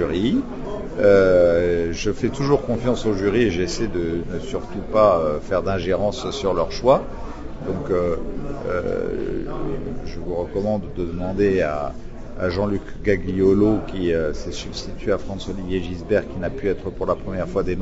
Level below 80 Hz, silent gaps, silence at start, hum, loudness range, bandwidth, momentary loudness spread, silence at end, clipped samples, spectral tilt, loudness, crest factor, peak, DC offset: -34 dBFS; none; 0 s; none; 6 LU; 8 kHz; 13 LU; 0 s; under 0.1%; -6.5 dB/octave; -22 LUFS; 18 dB; -2 dBFS; under 0.1%